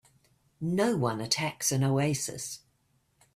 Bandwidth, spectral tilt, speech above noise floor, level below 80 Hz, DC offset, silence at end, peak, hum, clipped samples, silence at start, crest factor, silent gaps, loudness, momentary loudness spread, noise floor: 16 kHz; -4.5 dB/octave; 42 dB; -66 dBFS; under 0.1%; 0.8 s; -12 dBFS; none; under 0.1%; 0.6 s; 20 dB; none; -29 LUFS; 11 LU; -71 dBFS